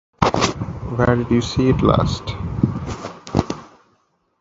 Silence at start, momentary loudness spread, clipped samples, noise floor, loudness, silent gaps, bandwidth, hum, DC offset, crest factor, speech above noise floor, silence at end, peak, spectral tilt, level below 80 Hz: 0.2 s; 13 LU; under 0.1%; -64 dBFS; -20 LUFS; none; 8 kHz; none; under 0.1%; 20 dB; 46 dB; 0.75 s; 0 dBFS; -6 dB/octave; -34 dBFS